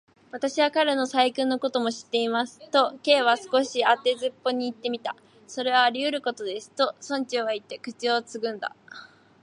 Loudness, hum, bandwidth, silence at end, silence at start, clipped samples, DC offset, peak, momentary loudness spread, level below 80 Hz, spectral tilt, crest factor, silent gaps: -25 LUFS; none; 11 kHz; 0.35 s; 0.35 s; under 0.1%; under 0.1%; -6 dBFS; 14 LU; -80 dBFS; -2.5 dB/octave; 20 dB; none